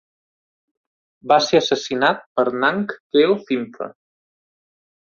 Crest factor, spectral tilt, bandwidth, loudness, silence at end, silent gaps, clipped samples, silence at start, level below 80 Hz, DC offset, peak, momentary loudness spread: 20 dB; -4 dB/octave; 7.4 kHz; -19 LUFS; 1.2 s; 2.26-2.36 s, 3.00-3.10 s; under 0.1%; 1.25 s; -64 dBFS; under 0.1%; -2 dBFS; 15 LU